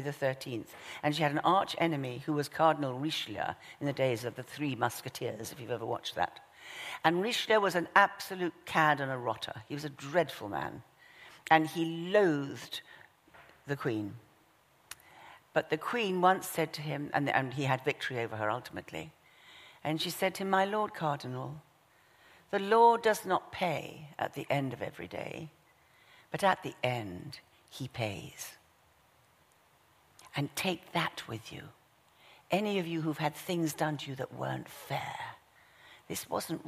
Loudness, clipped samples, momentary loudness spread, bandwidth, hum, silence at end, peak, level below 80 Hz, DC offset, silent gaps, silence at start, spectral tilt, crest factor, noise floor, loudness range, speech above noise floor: -33 LUFS; under 0.1%; 17 LU; 15.5 kHz; none; 0 s; -8 dBFS; -72 dBFS; under 0.1%; none; 0 s; -5 dB/octave; 26 dB; -66 dBFS; 8 LU; 34 dB